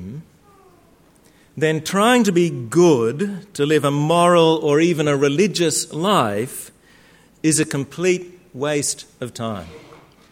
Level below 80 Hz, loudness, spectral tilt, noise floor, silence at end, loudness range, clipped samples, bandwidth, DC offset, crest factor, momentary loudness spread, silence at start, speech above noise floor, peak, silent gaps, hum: -60 dBFS; -18 LUFS; -4.5 dB/octave; -53 dBFS; 0.55 s; 6 LU; under 0.1%; 16.5 kHz; under 0.1%; 16 dB; 14 LU; 0 s; 35 dB; -2 dBFS; none; none